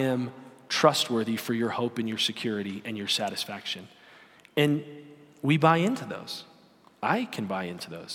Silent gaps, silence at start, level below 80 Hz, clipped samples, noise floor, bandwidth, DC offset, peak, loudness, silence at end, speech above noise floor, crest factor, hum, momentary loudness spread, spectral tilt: none; 0 s; -76 dBFS; under 0.1%; -58 dBFS; 18 kHz; under 0.1%; -6 dBFS; -28 LUFS; 0 s; 30 dB; 24 dB; none; 14 LU; -4.5 dB/octave